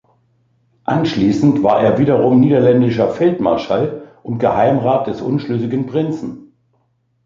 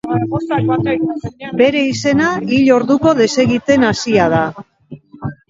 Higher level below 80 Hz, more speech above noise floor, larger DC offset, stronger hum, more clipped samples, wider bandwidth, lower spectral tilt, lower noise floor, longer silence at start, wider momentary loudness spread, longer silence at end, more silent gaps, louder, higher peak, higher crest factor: about the same, -50 dBFS vs -46 dBFS; first, 48 dB vs 23 dB; neither; neither; neither; about the same, 7.4 kHz vs 7.8 kHz; first, -8.5 dB/octave vs -5.5 dB/octave; first, -63 dBFS vs -37 dBFS; first, 0.9 s vs 0.05 s; about the same, 10 LU vs 10 LU; first, 0.85 s vs 0.15 s; neither; about the same, -15 LUFS vs -14 LUFS; about the same, -2 dBFS vs 0 dBFS; about the same, 14 dB vs 14 dB